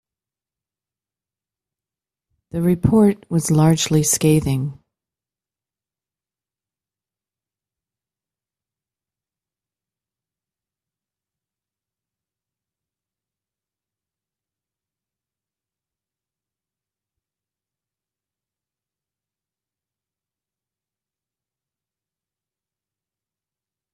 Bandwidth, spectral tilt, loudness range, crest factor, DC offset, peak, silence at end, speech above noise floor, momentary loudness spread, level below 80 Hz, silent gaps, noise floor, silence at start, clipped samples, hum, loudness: 14 kHz; -5.5 dB/octave; 7 LU; 24 dB; under 0.1%; -4 dBFS; 19.2 s; over 74 dB; 9 LU; -52 dBFS; none; under -90 dBFS; 2.55 s; under 0.1%; none; -17 LUFS